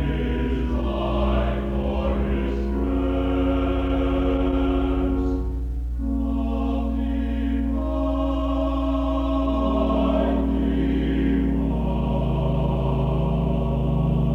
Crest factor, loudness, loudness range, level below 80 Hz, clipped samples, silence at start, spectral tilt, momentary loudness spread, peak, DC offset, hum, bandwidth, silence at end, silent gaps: 12 dB; -24 LUFS; 2 LU; -26 dBFS; under 0.1%; 0 s; -9.5 dB/octave; 3 LU; -10 dBFS; under 0.1%; 60 Hz at -25 dBFS; 4.2 kHz; 0 s; none